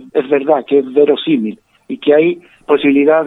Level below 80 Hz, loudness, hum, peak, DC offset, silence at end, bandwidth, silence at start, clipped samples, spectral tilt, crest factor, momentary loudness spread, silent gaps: -58 dBFS; -13 LUFS; none; 0 dBFS; under 0.1%; 0 s; 4 kHz; 0 s; under 0.1%; -8 dB/octave; 12 dB; 10 LU; none